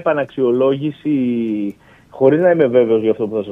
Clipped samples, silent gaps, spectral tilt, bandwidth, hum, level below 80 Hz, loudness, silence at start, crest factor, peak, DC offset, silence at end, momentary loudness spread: under 0.1%; none; -9.5 dB/octave; 3.9 kHz; none; -60 dBFS; -16 LUFS; 0 s; 16 dB; 0 dBFS; under 0.1%; 0 s; 8 LU